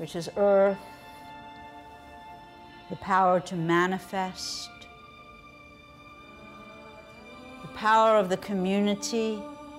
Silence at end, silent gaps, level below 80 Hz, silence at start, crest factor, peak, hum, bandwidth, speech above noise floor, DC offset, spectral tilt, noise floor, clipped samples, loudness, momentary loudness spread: 0 s; none; -62 dBFS; 0 s; 16 dB; -12 dBFS; none; 16 kHz; 25 dB; under 0.1%; -5 dB/octave; -50 dBFS; under 0.1%; -26 LUFS; 25 LU